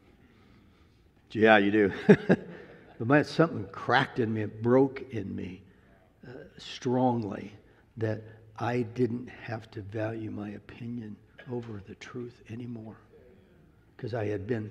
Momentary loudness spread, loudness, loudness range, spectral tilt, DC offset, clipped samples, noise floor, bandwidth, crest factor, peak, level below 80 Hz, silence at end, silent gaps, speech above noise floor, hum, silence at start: 21 LU; -28 LUFS; 15 LU; -7.5 dB/octave; under 0.1%; under 0.1%; -61 dBFS; 10 kHz; 26 dB; -4 dBFS; -66 dBFS; 0 s; none; 32 dB; none; 1.3 s